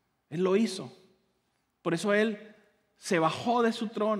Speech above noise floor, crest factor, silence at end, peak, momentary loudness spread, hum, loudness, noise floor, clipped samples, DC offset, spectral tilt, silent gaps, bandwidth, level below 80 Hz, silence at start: 48 dB; 18 dB; 0 s; -12 dBFS; 14 LU; none; -29 LUFS; -76 dBFS; under 0.1%; under 0.1%; -5 dB/octave; none; 13.5 kHz; -82 dBFS; 0.3 s